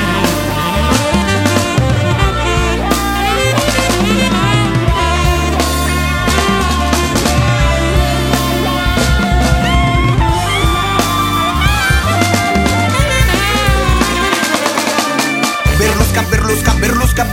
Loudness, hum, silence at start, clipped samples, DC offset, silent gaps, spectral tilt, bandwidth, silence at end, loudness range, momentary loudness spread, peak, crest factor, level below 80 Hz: -12 LUFS; none; 0 s; under 0.1%; under 0.1%; none; -4.5 dB/octave; 17 kHz; 0 s; 1 LU; 2 LU; 0 dBFS; 12 dB; -18 dBFS